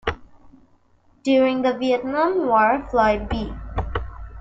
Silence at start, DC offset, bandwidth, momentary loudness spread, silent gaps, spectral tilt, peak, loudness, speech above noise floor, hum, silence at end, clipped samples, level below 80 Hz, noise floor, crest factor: 0.05 s; under 0.1%; 7.8 kHz; 12 LU; none; -6.5 dB/octave; -6 dBFS; -21 LUFS; 38 dB; none; 0 s; under 0.1%; -36 dBFS; -57 dBFS; 16 dB